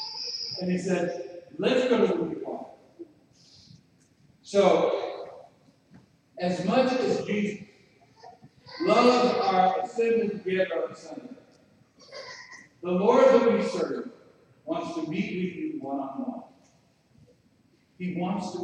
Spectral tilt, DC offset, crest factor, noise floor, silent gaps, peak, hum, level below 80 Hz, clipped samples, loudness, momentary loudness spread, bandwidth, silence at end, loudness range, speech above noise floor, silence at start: -6 dB/octave; under 0.1%; 20 dB; -64 dBFS; none; -8 dBFS; none; -72 dBFS; under 0.1%; -26 LUFS; 21 LU; 9.6 kHz; 0 s; 9 LU; 39 dB; 0 s